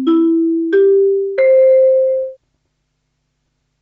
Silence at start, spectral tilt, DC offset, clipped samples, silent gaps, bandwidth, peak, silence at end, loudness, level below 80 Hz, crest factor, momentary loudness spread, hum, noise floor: 0 s; -7 dB/octave; under 0.1%; under 0.1%; none; 4.3 kHz; -4 dBFS; 1.45 s; -12 LUFS; -68 dBFS; 10 dB; 7 LU; none; -68 dBFS